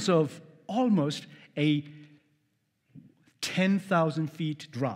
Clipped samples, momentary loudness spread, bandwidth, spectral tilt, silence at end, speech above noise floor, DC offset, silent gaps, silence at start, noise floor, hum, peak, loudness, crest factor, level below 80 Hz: under 0.1%; 12 LU; 15.5 kHz; -6 dB/octave; 0 s; 48 dB; under 0.1%; none; 0 s; -75 dBFS; none; -12 dBFS; -29 LUFS; 18 dB; -80 dBFS